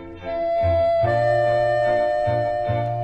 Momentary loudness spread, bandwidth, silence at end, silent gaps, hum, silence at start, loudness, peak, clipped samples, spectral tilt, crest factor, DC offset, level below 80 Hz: 5 LU; 8.2 kHz; 0 s; none; none; 0 s; -21 LUFS; -8 dBFS; under 0.1%; -7.5 dB/octave; 12 dB; under 0.1%; -42 dBFS